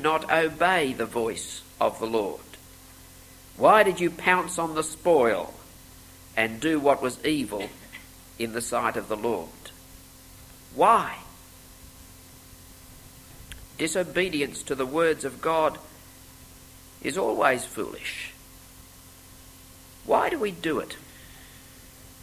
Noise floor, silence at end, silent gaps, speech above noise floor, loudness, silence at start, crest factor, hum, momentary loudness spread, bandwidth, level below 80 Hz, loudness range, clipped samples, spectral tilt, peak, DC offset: -49 dBFS; 0.1 s; none; 24 dB; -25 LUFS; 0 s; 24 dB; none; 25 LU; 16 kHz; -54 dBFS; 7 LU; under 0.1%; -4 dB/octave; -4 dBFS; under 0.1%